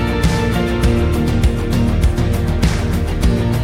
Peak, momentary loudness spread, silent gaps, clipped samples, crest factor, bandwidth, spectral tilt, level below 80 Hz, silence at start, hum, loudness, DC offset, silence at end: -2 dBFS; 2 LU; none; under 0.1%; 12 dB; 16.5 kHz; -6.5 dB/octave; -20 dBFS; 0 s; none; -17 LUFS; under 0.1%; 0 s